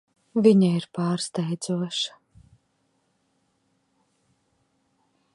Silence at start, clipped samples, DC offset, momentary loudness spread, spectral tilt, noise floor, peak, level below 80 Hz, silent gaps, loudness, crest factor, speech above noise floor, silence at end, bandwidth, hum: 0.35 s; under 0.1%; under 0.1%; 11 LU; -6 dB/octave; -71 dBFS; -6 dBFS; -70 dBFS; none; -24 LUFS; 22 dB; 48 dB; 3.25 s; 11 kHz; none